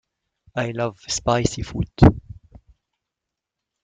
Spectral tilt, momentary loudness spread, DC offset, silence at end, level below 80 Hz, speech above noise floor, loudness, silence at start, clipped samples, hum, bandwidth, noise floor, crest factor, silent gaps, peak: -6 dB/octave; 13 LU; under 0.1%; 1.5 s; -34 dBFS; 65 dB; -21 LUFS; 0.55 s; under 0.1%; none; 9.4 kHz; -85 dBFS; 22 dB; none; -2 dBFS